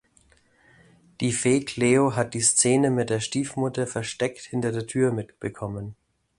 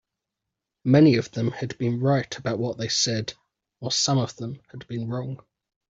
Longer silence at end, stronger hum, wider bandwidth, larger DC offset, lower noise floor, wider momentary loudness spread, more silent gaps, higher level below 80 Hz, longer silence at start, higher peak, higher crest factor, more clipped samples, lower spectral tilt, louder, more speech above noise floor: about the same, 0.45 s vs 0.55 s; neither; first, 11.5 kHz vs 8 kHz; neither; second, -61 dBFS vs -85 dBFS; second, 14 LU vs 18 LU; neither; about the same, -58 dBFS vs -62 dBFS; first, 1.2 s vs 0.85 s; about the same, -6 dBFS vs -6 dBFS; about the same, 20 dB vs 20 dB; neither; about the same, -4.5 dB/octave vs -5 dB/octave; about the same, -24 LUFS vs -24 LUFS; second, 37 dB vs 61 dB